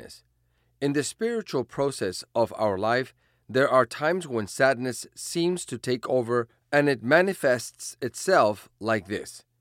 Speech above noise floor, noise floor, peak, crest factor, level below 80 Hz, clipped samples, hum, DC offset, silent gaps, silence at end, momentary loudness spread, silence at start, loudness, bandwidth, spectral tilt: 43 dB; -69 dBFS; -6 dBFS; 20 dB; -68 dBFS; under 0.1%; none; under 0.1%; none; 0.2 s; 11 LU; 0 s; -26 LUFS; 16.5 kHz; -4.5 dB/octave